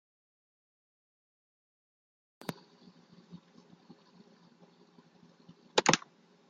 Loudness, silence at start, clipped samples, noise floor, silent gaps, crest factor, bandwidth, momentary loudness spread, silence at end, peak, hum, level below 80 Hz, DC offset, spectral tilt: -31 LUFS; 2.5 s; under 0.1%; -62 dBFS; none; 36 dB; 7.6 kHz; 28 LU; 0.5 s; -6 dBFS; none; -82 dBFS; under 0.1%; -2 dB/octave